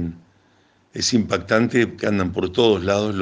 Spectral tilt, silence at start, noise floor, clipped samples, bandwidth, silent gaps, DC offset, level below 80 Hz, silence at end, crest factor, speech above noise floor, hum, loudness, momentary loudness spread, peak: -4.5 dB/octave; 0 s; -58 dBFS; under 0.1%; 10 kHz; none; under 0.1%; -54 dBFS; 0 s; 18 dB; 39 dB; none; -20 LUFS; 5 LU; -2 dBFS